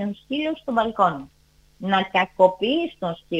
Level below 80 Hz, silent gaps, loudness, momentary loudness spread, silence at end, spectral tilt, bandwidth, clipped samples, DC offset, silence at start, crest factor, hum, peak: -58 dBFS; none; -22 LUFS; 11 LU; 0 s; -6.5 dB/octave; 8.8 kHz; under 0.1%; under 0.1%; 0 s; 20 dB; none; -2 dBFS